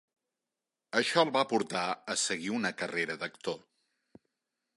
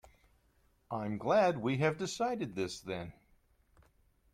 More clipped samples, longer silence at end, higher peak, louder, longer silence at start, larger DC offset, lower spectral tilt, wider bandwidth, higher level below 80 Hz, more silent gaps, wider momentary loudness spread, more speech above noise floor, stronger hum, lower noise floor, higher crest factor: neither; about the same, 1.2 s vs 1.2 s; first, -10 dBFS vs -18 dBFS; first, -31 LUFS vs -34 LUFS; about the same, 0.95 s vs 0.9 s; neither; second, -2.5 dB/octave vs -5.5 dB/octave; second, 11.5 kHz vs 15 kHz; second, -78 dBFS vs -66 dBFS; neither; second, 10 LU vs 14 LU; first, 58 dB vs 38 dB; neither; first, -89 dBFS vs -71 dBFS; first, 24 dB vs 18 dB